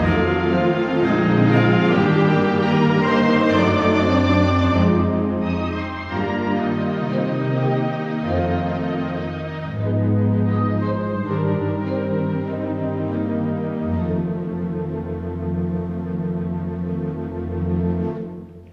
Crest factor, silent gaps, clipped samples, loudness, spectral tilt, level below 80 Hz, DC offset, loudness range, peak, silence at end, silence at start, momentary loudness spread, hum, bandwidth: 16 dB; none; under 0.1%; -20 LUFS; -8.5 dB/octave; -42 dBFS; under 0.1%; 8 LU; -4 dBFS; 0 s; 0 s; 10 LU; none; 7.6 kHz